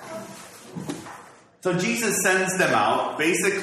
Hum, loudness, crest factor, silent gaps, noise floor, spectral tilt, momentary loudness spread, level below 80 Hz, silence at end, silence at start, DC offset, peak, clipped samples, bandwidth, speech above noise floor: none; -22 LUFS; 18 dB; none; -47 dBFS; -3.5 dB/octave; 20 LU; -66 dBFS; 0 s; 0 s; under 0.1%; -6 dBFS; under 0.1%; 14 kHz; 25 dB